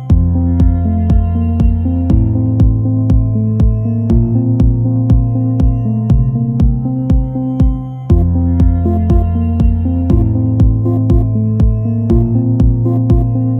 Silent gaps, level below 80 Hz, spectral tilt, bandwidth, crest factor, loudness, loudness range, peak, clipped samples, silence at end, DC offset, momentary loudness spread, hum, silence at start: none; -16 dBFS; -11.5 dB/octave; 3.6 kHz; 10 dB; -13 LUFS; 1 LU; 0 dBFS; under 0.1%; 0 s; under 0.1%; 3 LU; none; 0 s